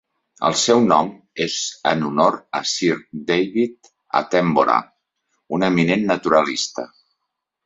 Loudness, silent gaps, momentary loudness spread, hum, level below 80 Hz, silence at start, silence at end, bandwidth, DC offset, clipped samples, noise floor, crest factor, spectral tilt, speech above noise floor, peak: -19 LUFS; none; 10 LU; none; -60 dBFS; 0.4 s; 0.8 s; 8.2 kHz; under 0.1%; under 0.1%; -79 dBFS; 18 dB; -4 dB/octave; 60 dB; -2 dBFS